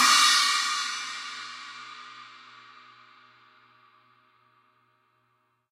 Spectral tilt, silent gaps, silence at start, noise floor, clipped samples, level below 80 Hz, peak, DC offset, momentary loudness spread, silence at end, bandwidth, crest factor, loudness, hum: 3.5 dB/octave; none; 0 s; -72 dBFS; under 0.1%; under -90 dBFS; -6 dBFS; under 0.1%; 28 LU; 3.35 s; 16 kHz; 22 dB; -23 LUFS; none